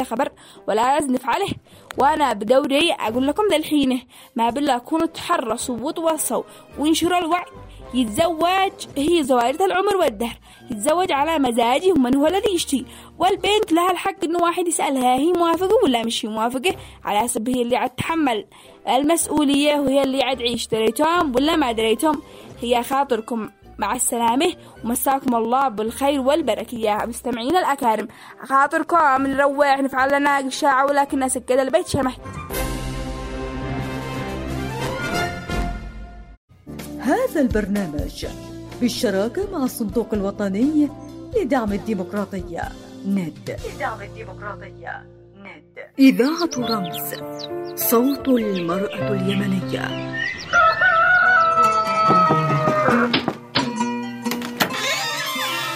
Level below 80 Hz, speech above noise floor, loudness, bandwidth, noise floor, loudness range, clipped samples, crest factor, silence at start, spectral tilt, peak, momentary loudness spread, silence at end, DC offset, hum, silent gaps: -42 dBFS; 22 dB; -20 LUFS; 16 kHz; -42 dBFS; 7 LU; under 0.1%; 18 dB; 0 s; -4 dB/octave; -4 dBFS; 13 LU; 0 s; under 0.1%; none; 36.37-36.48 s